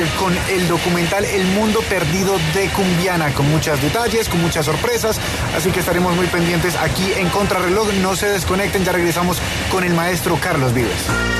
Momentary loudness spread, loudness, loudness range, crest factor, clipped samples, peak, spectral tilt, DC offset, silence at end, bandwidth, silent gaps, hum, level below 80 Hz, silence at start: 2 LU; -17 LUFS; 1 LU; 12 dB; under 0.1%; -4 dBFS; -4.5 dB/octave; under 0.1%; 0 s; 14 kHz; none; none; -32 dBFS; 0 s